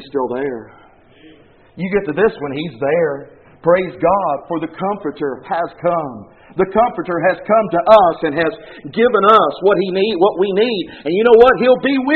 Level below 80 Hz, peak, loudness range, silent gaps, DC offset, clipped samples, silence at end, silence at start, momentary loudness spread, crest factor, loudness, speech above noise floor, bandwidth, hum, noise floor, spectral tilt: -48 dBFS; 0 dBFS; 6 LU; none; 0.1%; under 0.1%; 0 s; 0 s; 14 LU; 16 dB; -15 LUFS; 31 dB; 4.8 kHz; none; -46 dBFS; -4 dB/octave